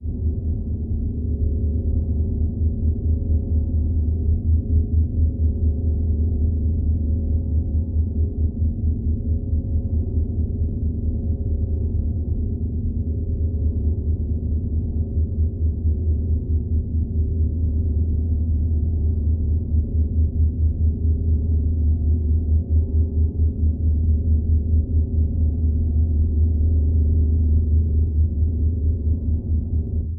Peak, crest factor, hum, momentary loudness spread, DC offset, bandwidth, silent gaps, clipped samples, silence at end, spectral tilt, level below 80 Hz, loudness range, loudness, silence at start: -8 dBFS; 12 dB; none; 4 LU; under 0.1%; 0.8 kHz; none; under 0.1%; 0 s; -19.5 dB/octave; -22 dBFS; 4 LU; -22 LUFS; 0 s